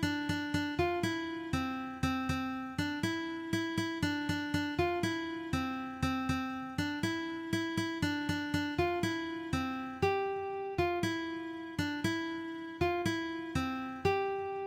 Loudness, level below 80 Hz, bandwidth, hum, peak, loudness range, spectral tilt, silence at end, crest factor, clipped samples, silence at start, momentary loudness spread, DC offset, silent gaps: -35 LUFS; -54 dBFS; 16.5 kHz; none; -18 dBFS; 1 LU; -5.5 dB/octave; 0 s; 16 dB; under 0.1%; 0 s; 5 LU; under 0.1%; none